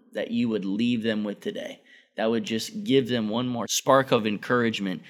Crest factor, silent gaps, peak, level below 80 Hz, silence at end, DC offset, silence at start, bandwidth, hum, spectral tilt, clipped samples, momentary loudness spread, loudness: 20 dB; none; -6 dBFS; -72 dBFS; 0 s; under 0.1%; 0.15 s; 17 kHz; none; -4.5 dB/octave; under 0.1%; 12 LU; -25 LUFS